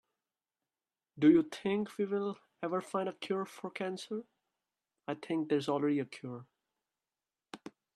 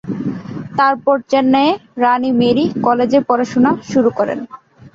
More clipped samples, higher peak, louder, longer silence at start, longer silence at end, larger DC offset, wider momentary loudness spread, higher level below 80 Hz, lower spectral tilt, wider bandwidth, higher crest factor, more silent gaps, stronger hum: neither; second, -14 dBFS vs -2 dBFS; second, -34 LUFS vs -15 LUFS; first, 1.15 s vs 0.05 s; first, 0.25 s vs 0.05 s; neither; first, 20 LU vs 10 LU; second, -80 dBFS vs -54 dBFS; about the same, -6.5 dB/octave vs -6.5 dB/octave; first, 12 kHz vs 7.6 kHz; first, 22 dB vs 14 dB; neither; neither